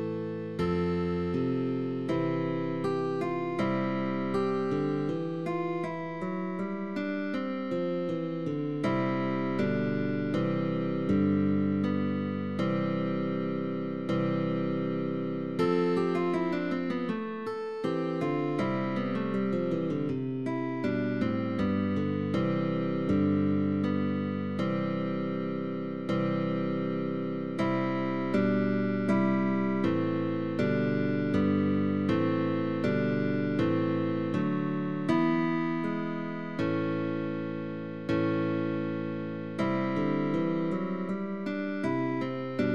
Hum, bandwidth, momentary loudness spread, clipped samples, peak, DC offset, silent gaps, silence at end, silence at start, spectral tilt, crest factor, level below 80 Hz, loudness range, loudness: none; 8.6 kHz; 6 LU; under 0.1%; -14 dBFS; 0.3%; none; 0 s; 0 s; -8.5 dB/octave; 16 dB; -62 dBFS; 3 LU; -30 LUFS